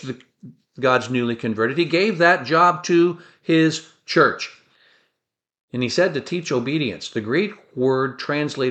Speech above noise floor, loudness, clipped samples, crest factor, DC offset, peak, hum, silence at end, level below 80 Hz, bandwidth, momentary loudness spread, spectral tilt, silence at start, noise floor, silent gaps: 62 dB; -20 LUFS; under 0.1%; 18 dB; under 0.1%; -2 dBFS; none; 0 s; -66 dBFS; 8.6 kHz; 12 LU; -5.5 dB/octave; 0 s; -82 dBFS; 5.60-5.68 s